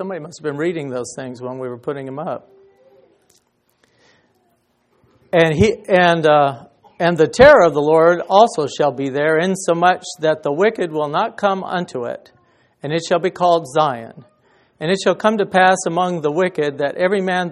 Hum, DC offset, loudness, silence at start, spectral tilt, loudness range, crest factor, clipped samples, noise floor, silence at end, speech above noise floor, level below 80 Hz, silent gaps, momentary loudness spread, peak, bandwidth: none; under 0.1%; -16 LUFS; 0 s; -5 dB/octave; 16 LU; 18 dB; under 0.1%; -63 dBFS; 0 s; 46 dB; -48 dBFS; none; 14 LU; 0 dBFS; 12 kHz